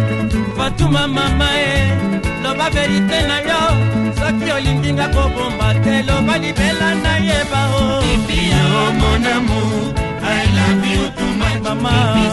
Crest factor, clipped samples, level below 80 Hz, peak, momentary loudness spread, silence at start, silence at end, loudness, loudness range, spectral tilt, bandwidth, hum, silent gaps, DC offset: 14 dB; under 0.1%; -24 dBFS; 0 dBFS; 4 LU; 0 s; 0 s; -15 LUFS; 1 LU; -5.5 dB/octave; 12 kHz; none; none; under 0.1%